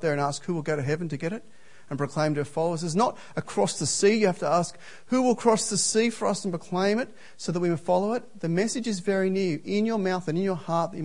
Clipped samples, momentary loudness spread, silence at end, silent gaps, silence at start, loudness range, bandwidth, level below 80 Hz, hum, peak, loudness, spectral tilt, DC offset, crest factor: under 0.1%; 9 LU; 0 s; none; 0 s; 4 LU; 11 kHz; -68 dBFS; none; -8 dBFS; -26 LUFS; -4.5 dB/octave; 0.6%; 18 dB